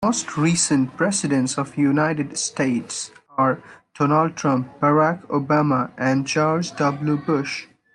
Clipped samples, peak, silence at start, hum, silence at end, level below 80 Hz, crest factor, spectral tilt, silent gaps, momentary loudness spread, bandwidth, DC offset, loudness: under 0.1%; -6 dBFS; 0 s; none; 0.3 s; -60 dBFS; 16 dB; -5 dB/octave; none; 6 LU; 11 kHz; under 0.1%; -21 LUFS